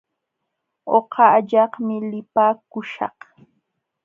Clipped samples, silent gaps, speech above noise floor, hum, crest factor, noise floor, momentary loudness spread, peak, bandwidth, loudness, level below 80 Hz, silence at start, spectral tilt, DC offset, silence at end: under 0.1%; none; 59 dB; none; 20 dB; -78 dBFS; 14 LU; -2 dBFS; 6.6 kHz; -19 LUFS; -76 dBFS; 0.85 s; -8 dB/octave; under 0.1%; 0.95 s